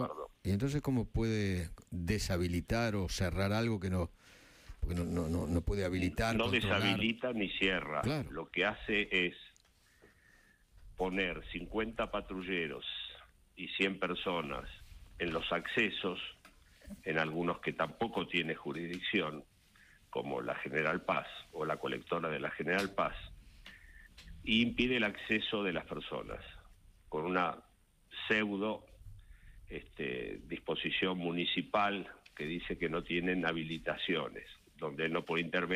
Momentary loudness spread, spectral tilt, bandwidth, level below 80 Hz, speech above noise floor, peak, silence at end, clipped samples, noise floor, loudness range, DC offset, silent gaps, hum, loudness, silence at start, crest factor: 13 LU; -5.5 dB/octave; 15.5 kHz; -52 dBFS; 32 dB; -18 dBFS; 0 s; under 0.1%; -67 dBFS; 5 LU; under 0.1%; none; none; -35 LUFS; 0 s; 20 dB